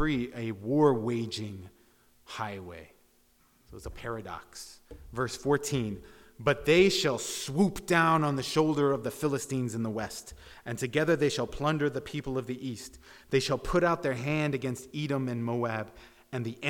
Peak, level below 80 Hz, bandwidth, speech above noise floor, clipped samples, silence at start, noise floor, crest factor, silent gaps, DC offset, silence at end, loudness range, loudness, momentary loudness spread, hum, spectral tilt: -10 dBFS; -52 dBFS; 18 kHz; 36 dB; under 0.1%; 0 s; -65 dBFS; 20 dB; none; under 0.1%; 0 s; 13 LU; -29 LUFS; 18 LU; none; -5 dB/octave